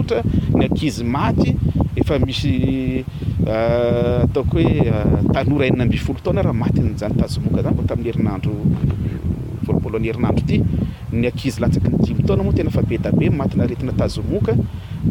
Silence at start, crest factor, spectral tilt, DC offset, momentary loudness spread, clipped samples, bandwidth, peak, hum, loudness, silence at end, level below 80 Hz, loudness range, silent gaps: 0 s; 14 dB; -8 dB/octave; under 0.1%; 5 LU; under 0.1%; 15.5 kHz; -4 dBFS; none; -19 LUFS; 0 s; -30 dBFS; 3 LU; none